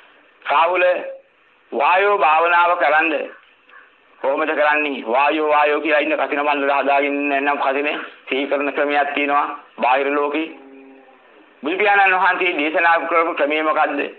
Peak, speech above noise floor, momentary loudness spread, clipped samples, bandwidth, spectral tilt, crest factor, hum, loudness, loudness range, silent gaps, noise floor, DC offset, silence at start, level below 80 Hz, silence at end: -4 dBFS; 37 dB; 10 LU; under 0.1%; 4.5 kHz; -5.5 dB/octave; 14 dB; none; -17 LUFS; 3 LU; none; -55 dBFS; under 0.1%; 0.45 s; -78 dBFS; 0.05 s